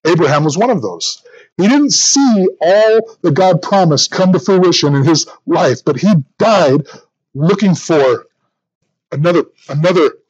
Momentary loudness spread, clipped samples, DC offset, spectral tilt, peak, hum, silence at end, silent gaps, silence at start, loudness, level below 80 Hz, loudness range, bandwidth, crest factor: 8 LU; under 0.1%; under 0.1%; -4.5 dB/octave; 0 dBFS; none; 0.15 s; 1.52-1.56 s, 8.75-8.81 s; 0.05 s; -12 LUFS; -64 dBFS; 4 LU; 8.8 kHz; 12 dB